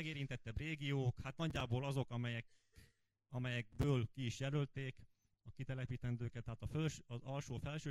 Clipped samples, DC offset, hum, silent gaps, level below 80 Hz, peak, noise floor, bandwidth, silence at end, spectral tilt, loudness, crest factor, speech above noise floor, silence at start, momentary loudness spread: under 0.1%; under 0.1%; none; none; -60 dBFS; -24 dBFS; -74 dBFS; 12.5 kHz; 0 s; -6.5 dB/octave; -43 LUFS; 18 dB; 31 dB; 0 s; 9 LU